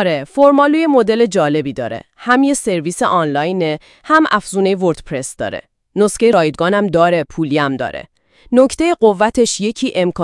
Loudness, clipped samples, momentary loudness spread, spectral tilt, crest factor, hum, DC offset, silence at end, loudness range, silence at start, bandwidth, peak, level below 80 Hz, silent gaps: -14 LUFS; under 0.1%; 12 LU; -5 dB/octave; 14 dB; none; under 0.1%; 0 s; 2 LU; 0 s; 12 kHz; 0 dBFS; -46 dBFS; none